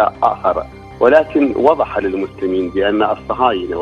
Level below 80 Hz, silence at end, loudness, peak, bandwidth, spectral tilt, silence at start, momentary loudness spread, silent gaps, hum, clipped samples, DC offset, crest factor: -42 dBFS; 0 s; -15 LUFS; 0 dBFS; 6.8 kHz; -7 dB/octave; 0 s; 8 LU; none; none; under 0.1%; under 0.1%; 16 dB